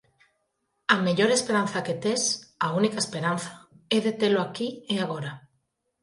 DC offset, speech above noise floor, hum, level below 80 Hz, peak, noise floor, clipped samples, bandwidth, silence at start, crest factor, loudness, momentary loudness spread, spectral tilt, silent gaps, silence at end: under 0.1%; 51 dB; none; -70 dBFS; -6 dBFS; -76 dBFS; under 0.1%; 11.5 kHz; 0.9 s; 22 dB; -26 LUFS; 11 LU; -4 dB/octave; none; 0.65 s